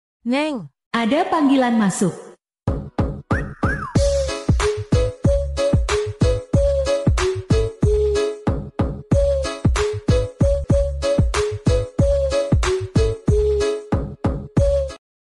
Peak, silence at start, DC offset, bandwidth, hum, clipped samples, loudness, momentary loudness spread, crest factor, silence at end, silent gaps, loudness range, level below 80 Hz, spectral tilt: -6 dBFS; 0.25 s; under 0.1%; 12 kHz; none; under 0.1%; -20 LUFS; 7 LU; 12 dB; 0.25 s; 0.86-0.91 s; 1 LU; -26 dBFS; -6.5 dB/octave